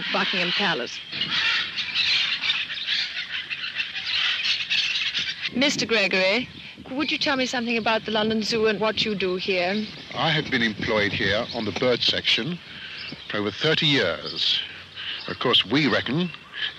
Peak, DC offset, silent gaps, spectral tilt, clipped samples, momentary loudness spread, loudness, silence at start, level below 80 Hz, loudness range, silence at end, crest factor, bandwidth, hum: -10 dBFS; under 0.1%; none; -3.5 dB/octave; under 0.1%; 10 LU; -23 LUFS; 0 s; -58 dBFS; 1 LU; 0 s; 16 dB; 14 kHz; none